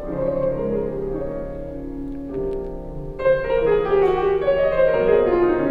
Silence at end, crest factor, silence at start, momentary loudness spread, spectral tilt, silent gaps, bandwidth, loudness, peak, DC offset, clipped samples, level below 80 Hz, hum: 0 s; 16 dB; 0 s; 14 LU; -9 dB/octave; none; 5 kHz; -21 LUFS; -6 dBFS; under 0.1%; under 0.1%; -36 dBFS; none